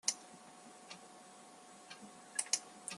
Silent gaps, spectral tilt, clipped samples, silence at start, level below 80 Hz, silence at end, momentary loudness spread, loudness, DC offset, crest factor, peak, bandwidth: none; 0.5 dB/octave; under 0.1%; 0.05 s; under -90 dBFS; 0 s; 20 LU; -41 LUFS; under 0.1%; 30 dB; -16 dBFS; 12.5 kHz